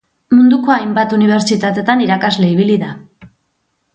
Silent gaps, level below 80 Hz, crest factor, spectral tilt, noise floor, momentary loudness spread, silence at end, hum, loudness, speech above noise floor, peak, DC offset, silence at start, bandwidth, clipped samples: none; -56 dBFS; 12 dB; -6 dB/octave; -65 dBFS; 5 LU; 0.7 s; none; -12 LUFS; 53 dB; 0 dBFS; under 0.1%; 0.3 s; 9 kHz; under 0.1%